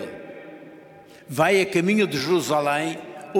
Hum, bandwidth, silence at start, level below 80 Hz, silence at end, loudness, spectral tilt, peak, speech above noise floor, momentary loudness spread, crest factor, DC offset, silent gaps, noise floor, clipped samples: none; 17 kHz; 0 s; -66 dBFS; 0 s; -22 LUFS; -5 dB/octave; -6 dBFS; 26 dB; 20 LU; 18 dB; under 0.1%; none; -47 dBFS; under 0.1%